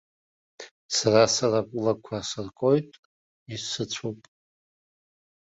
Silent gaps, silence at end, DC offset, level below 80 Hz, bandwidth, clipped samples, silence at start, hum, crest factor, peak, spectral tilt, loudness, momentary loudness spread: 0.71-0.89 s, 2.99-3.46 s; 1.35 s; under 0.1%; -64 dBFS; 8 kHz; under 0.1%; 0.6 s; none; 22 dB; -6 dBFS; -4 dB/octave; -25 LUFS; 25 LU